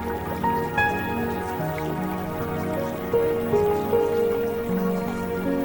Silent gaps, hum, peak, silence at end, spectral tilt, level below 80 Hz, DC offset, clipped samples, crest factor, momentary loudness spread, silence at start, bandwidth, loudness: none; none; -10 dBFS; 0 s; -7 dB/octave; -48 dBFS; under 0.1%; under 0.1%; 14 dB; 6 LU; 0 s; 18 kHz; -25 LUFS